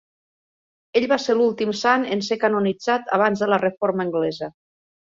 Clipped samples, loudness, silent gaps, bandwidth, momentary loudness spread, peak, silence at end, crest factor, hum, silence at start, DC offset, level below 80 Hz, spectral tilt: under 0.1%; -21 LUFS; none; 7.6 kHz; 5 LU; -4 dBFS; 0.65 s; 18 dB; none; 0.95 s; under 0.1%; -66 dBFS; -5 dB/octave